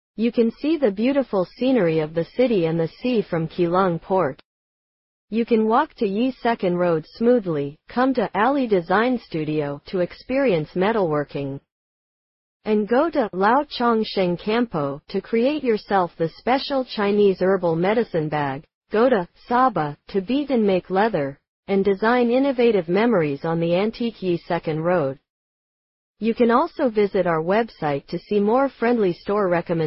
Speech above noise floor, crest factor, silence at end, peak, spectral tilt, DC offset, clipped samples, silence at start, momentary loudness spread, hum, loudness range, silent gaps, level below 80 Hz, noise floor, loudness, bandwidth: over 69 dB; 16 dB; 0 s; -6 dBFS; -10.5 dB/octave; under 0.1%; under 0.1%; 0.2 s; 7 LU; none; 3 LU; 4.45-5.28 s, 11.72-12.60 s, 18.74-18.81 s, 21.48-21.63 s, 25.30-26.14 s; -56 dBFS; under -90 dBFS; -21 LUFS; 5.8 kHz